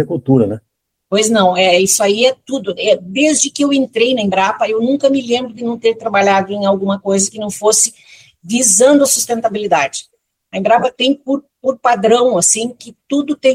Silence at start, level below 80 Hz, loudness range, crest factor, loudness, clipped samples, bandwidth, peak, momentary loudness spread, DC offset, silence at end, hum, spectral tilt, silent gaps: 0 s; -58 dBFS; 2 LU; 14 dB; -13 LUFS; under 0.1%; 16.5 kHz; 0 dBFS; 9 LU; under 0.1%; 0 s; none; -3 dB/octave; none